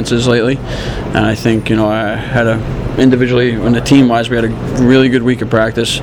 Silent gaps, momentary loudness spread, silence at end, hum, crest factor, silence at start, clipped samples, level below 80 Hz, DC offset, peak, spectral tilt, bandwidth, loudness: none; 8 LU; 0 s; none; 12 dB; 0 s; under 0.1%; -28 dBFS; under 0.1%; 0 dBFS; -6 dB/octave; 14 kHz; -12 LUFS